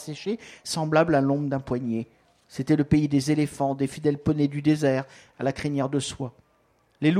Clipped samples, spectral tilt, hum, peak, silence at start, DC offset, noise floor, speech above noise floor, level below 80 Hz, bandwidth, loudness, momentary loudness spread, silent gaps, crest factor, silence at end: under 0.1%; -6.5 dB/octave; none; -8 dBFS; 0 s; under 0.1%; -65 dBFS; 40 dB; -52 dBFS; 13.5 kHz; -25 LUFS; 12 LU; none; 18 dB; 0 s